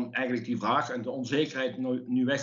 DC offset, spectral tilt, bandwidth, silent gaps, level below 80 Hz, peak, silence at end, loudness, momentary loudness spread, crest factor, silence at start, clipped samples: under 0.1%; -4 dB/octave; 7.4 kHz; none; -82 dBFS; -14 dBFS; 0 s; -30 LUFS; 5 LU; 16 dB; 0 s; under 0.1%